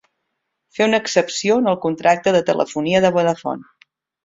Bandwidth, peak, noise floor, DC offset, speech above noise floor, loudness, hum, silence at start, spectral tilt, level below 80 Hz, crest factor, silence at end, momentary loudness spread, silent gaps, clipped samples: 7.8 kHz; -2 dBFS; -75 dBFS; under 0.1%; 58 dB; -18 LUFS; none; 0.75 s; -4.5 dB/octave; -58 dBFS; 16 dB; 0.6 s; 9 LU; none; under 0.1%